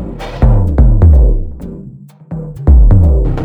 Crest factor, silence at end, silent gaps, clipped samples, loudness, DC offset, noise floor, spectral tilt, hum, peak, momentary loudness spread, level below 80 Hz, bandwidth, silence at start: 8 dB; 0 s; none; under 0.1%; -10 LUFS; under 0.1%; -33 dBFS; -10 dB/octave; none; 0 dBFS; 19 LU; -10 dBFS; 4.5 kHz; 0 s